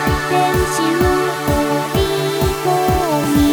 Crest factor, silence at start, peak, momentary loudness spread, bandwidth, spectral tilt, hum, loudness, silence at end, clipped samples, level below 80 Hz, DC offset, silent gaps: 14 dB; 0 s; 0 dBFS; 3 LU; over 20 kHz; -5 dB/octave; none; -16 LUFS; 0 s; under 0.1%; -28 dBFS; under 0.1%; none